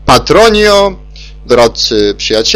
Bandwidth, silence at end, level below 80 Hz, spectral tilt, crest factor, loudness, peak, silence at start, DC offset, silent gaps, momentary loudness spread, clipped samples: 16.5 kHz; 0 s; -26 dBFS; -3.5 dB/octave; 8 dB; -8 LUFS; 0 dBFS; 0 s; under 0.1%; none; 6 LU; 1%